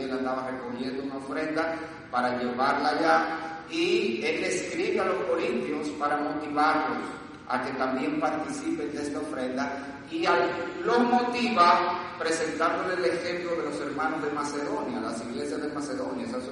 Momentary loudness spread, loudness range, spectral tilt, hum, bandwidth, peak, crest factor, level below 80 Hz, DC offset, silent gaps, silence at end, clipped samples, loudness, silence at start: 9 LU; 5 LU; -4 dB/octave; none; 10.5 kHz; -8 dBFS; 20 dB; -64 dBFS; under 0.1%; none; 0 s; under 0.1%; -28 LUFS; 0 s